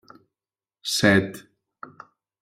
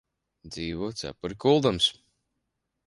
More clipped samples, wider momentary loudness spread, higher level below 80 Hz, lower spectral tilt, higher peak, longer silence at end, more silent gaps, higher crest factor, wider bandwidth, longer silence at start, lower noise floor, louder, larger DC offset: neither; first, 26 LU vs 14 LU; second, -60 dBFS vs -54 dBFS; about the same, -4 dB/octave vs -5 dB/octave; first, -4 dBFS vs -8 dBFS; about the same, 1 s vs 0.95 s; neither; about the same, 22 dB vs 20 dB; first, 16 kHz vs 11.5 kHz; first, 0.85 s vs 0.45 s; first, under -90 dBFS vs -81 dBFS; first, -22 LUFS vs -26 LUFS; neither